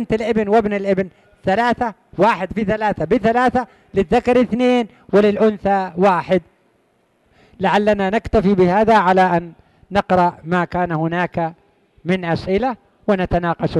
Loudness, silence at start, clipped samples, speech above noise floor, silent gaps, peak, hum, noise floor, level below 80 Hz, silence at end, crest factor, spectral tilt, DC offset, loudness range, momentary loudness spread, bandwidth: -17 LUFS; 0 s; under 0.1%; 44 dB; none; -4 dBFS; none; -61 dBFS; -40 dBFS; 0 s; 14 dB; -7.5 dB/octave; under 0.1%; 4 LU; 8 LU; 11.5 kHz